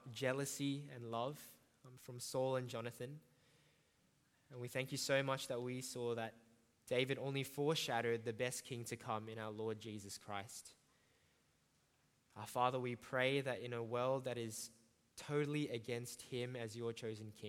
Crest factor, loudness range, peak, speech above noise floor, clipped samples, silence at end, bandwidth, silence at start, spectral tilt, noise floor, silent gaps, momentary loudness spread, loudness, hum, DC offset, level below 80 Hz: 22 dB; 6 LU; -22 dBFS; 35 dB; under 0.1%; 0 s; 17 kHz; 0 s; -4.5 dB/octave; -78 dBFS; none; 14 LU; -43 LUFS; none; under 0.1%; -84 dBFS